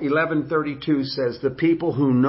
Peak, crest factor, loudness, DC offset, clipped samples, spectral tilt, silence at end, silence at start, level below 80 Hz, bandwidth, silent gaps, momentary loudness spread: -8 dBFS; 12 dB; -22 LUFS; under 0.1%; under 0.1%; -11 dB/octave; 0 s; 0 s; -56 dBFS; 5.8 kHz; none; 4 LU